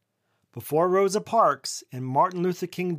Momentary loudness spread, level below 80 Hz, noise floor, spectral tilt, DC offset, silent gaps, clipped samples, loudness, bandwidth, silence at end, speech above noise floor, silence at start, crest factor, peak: 12 LU; -80 dBFS; -74 dBFS; -5.5 dB/octave; under 0.1%; none; under 0.1%; -24 LUFS; 15.5 kHz; 0 s; 49 dB; 0.55 s; 16 dB; -8 dBFS